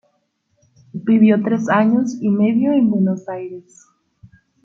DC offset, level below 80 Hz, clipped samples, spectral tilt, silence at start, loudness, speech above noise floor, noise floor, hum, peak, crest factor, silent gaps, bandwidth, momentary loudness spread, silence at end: under 0.1%; -64 dBFS; under 0.1%; -8 dB/octave; 0.95 s; -16 LUFS; 51 dB; -67 dBFS; none; -2 dBFS; 16 dB; none; 7.4 kHz; 16 LU; 1.05 s